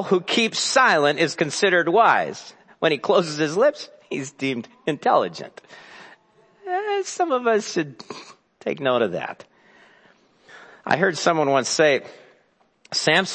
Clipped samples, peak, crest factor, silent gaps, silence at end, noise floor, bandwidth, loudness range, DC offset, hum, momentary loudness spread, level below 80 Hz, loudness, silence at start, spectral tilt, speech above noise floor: under 0.1%; -2 dBFS; 20 dB; none; 0 s; -62 dBFS; 8.8 kHz; 7 LU; under 0.1%; none; 19 LU; -74 dBFS; -21 LUFS; 0 s; -3.5 dB/octave; 41 dB